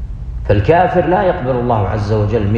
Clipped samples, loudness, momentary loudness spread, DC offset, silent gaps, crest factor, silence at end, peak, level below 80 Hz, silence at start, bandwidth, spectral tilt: under 0.1%; -14 LUFS; 5 LU; under 0.1%; none; 14 dB; 0 s; 0 dBFS; -26 dBFS; 0 s; 7 kHz; -9 dB/octave